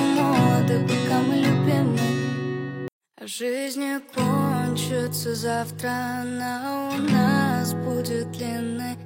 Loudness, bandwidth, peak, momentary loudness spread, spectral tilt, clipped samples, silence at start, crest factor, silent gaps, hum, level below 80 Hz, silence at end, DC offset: -24 LUFS; 16.5 kHz; -6 dBFS; 10 LU; -6 dB/octave; under 0.1%; 0 s; 16 dB; 2.92-3.01 s; none; -62 dBFS; 0 s; under 0.1%